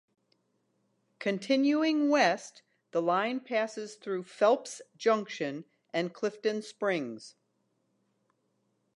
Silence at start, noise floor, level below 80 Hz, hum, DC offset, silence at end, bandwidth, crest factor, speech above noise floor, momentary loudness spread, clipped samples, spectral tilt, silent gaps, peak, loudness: 1.2 s; -76 dBFS; -88 dBFS; none; under 0.1%; 1.65 s; 11.5 kHz; 20 dB; 47 dB; 11 LU; under 0.1%; -4.5 dB/octave; none; -12 dBFS; -30 LUFS